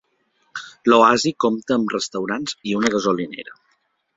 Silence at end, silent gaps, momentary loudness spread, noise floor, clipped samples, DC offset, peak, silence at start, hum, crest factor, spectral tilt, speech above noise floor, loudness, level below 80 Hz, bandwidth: 0.65 s; none; 21 LU; -67 dBFS; under 0.1%; under 0.1%; 0 dBFS; 0.55 s; none; 20 dB; -4 dB/octave; 48 dB; -19 LUFS; -60 dBFS; 8 kHz